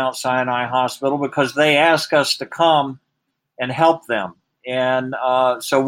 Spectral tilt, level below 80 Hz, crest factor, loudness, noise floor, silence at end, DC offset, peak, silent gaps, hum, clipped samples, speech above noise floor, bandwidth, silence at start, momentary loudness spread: -4 dB/octave; -68 dBFS; 18 dB; -18 LUFS; -75 dBFS; 0 s; under 0.1%; -2 dBFS; none; none; under 0.1%; 57 dB; 16.5 kHz; 0 s; 11 LU